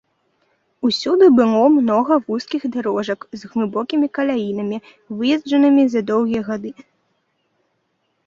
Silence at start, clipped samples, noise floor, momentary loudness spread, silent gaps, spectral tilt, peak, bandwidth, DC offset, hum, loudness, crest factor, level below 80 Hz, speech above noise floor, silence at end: 0.85 s; under 0.1%; -69 dBFS; 13 LU; none; -6 dB/octave; -2 dBFS; 7.6 kHz; under 0.1%; none; -18 LUFS; 16 dB; -62 dBFS; 52 dB; 1.55 s